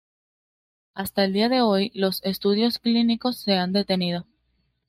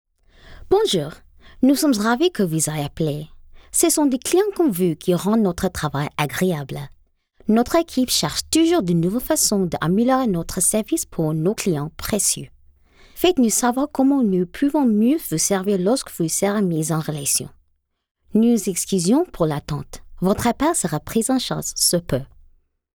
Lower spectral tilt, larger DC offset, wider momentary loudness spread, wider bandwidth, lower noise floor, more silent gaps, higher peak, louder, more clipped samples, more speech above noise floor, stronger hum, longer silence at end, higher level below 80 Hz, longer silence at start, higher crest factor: about the same, -5.5 dB/octave vs -4.5 dB/octave; neither; about the same, 8 LU vs 7 LU; second, 16 kHz vs over 20 kHz; about the same, -70 dBFS vs -67 dBFS; second, none vs 18.11-18.15 s; about the same, -8 dBFS vs -6 dBFS; second, -23 LUFS vs -20 LUFS; neither; about the same, 48 dB vs 48 dB; neither; about the same, 0.65 s vs 0.7 s; second, -62 dBFS vs -46 dBFS; first, 0.95 s vs 0.5 s; about the same, 16 dB vs 14 dB